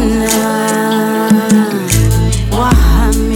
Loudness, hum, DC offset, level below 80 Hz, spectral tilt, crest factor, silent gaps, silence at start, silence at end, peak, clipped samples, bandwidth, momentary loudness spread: -12 LUFS; none; under 0.1%; -16 dBFS; -5.5 dB/octave; 10 dB; none; 0 s; 0 s; 0 dBFS; under 0.1%; 18.5 kHz; 3 LU